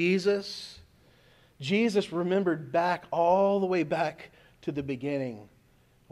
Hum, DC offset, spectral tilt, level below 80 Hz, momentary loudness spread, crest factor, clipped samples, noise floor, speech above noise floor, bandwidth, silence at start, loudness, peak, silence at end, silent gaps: none; under 0.1%; -6 dB/octave; -66 dBFS; 15 LU; 16 dB; under 0.1%; -63 dBFS; 35 dB; 12.5 kHz; 0 s; -28 LUFS; -14 dBFS; 0.65 s; none